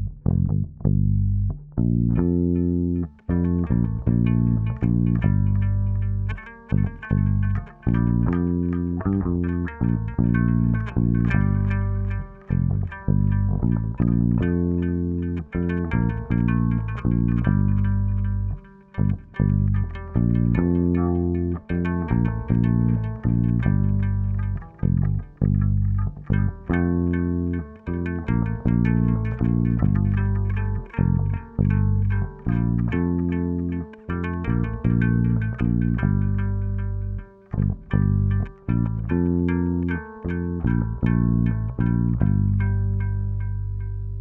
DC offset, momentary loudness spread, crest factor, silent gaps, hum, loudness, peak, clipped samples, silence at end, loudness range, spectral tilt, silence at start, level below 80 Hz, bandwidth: under 0.1%; 7 LU; 16 dB; none; none; -23 LUFS; -6 dBFS; under 0.1%; 0 s; 2 LU; -12 dB/octave; 0 s; -32 dBFS; 3.4 kHz